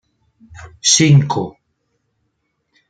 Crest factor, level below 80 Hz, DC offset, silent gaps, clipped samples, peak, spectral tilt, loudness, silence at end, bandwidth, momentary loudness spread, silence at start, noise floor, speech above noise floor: 18 dB; -52 dBFS; under 0.1%; none; under 0.1%; 0 dBFS; -4 dB/octave; -13 LUFS; 1.4 s; 9.4 kHz; 14 LU; 0.55 s; -69 dBFS; 55 dB